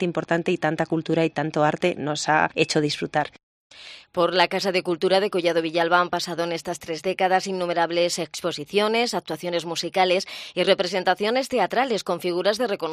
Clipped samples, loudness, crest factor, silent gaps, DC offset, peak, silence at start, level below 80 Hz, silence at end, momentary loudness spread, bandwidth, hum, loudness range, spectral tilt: under 0.1%; -23 LUFS; 20 dB; 3.43-3.70 s; under 0.1%; -2 dBFS; 0 s; -66 dBFS; 0 s; 7 LU; 15 kHz; none; 1 LU; -4 dB/octave